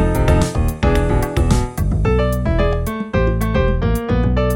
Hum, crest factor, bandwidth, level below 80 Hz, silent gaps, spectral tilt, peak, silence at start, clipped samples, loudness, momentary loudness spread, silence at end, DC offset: none; 14 dB; 17 kHz; -20 dBFS; none; -7 dB/octave; -2 dBFS; 0 s; under 0.1%; -18 LUFS; 3 LU; 0 s; under 0.1%